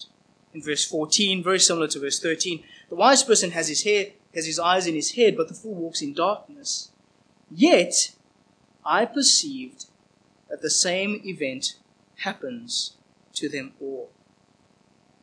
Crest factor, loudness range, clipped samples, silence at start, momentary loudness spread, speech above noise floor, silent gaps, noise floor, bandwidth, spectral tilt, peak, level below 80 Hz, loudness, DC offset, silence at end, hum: 22 dB; 9 LU; under 0.1%; 0 s; 18 LU; 38 dB; none; -61 dBFS; 10.5 kHz; -2 dB/octave; -2 dBFS; -78 dBFS; -22 LUFS; under 0.1%; 1.15 s; none